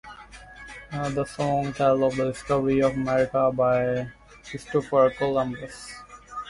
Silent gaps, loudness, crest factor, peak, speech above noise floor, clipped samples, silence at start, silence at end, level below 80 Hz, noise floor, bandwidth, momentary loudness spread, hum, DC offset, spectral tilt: none; -24 LUFS; 16 dB; -8 dBFS; 21 dB; under 0.1%; 0.05 s; 0 s; -52 dBFS; -45 dBFS; 11.5 kHz; 20 LU; none; under 0.1%; -6.5 dB/octave